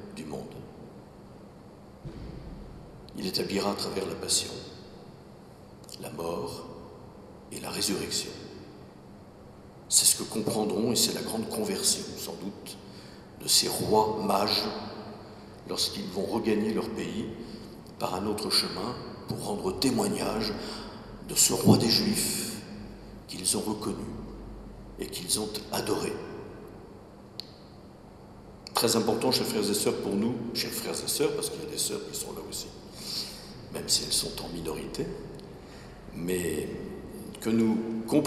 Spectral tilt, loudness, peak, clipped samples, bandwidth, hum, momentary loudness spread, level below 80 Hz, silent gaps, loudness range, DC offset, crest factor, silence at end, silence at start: -3 dB/octave; -28 LUFS; -4 dBFS; under 0.1%; 16 kHz; none; 23 LU; -54 dBFS; none; 9 LU; under 0.1%; 26 dB; 0 s; 0 s